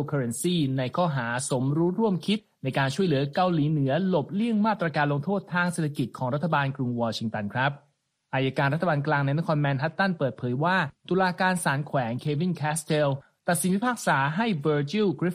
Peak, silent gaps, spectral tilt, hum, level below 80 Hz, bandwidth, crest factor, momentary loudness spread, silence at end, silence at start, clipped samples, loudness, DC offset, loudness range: -10 dBFS; none; -5.5 dB/octave; none; -64 dBFS; 15 kHz; 16 dB; 5 LU; 0 s; 0 s; under 0.1%; -26 LUFS; under 0.1%; 2 LU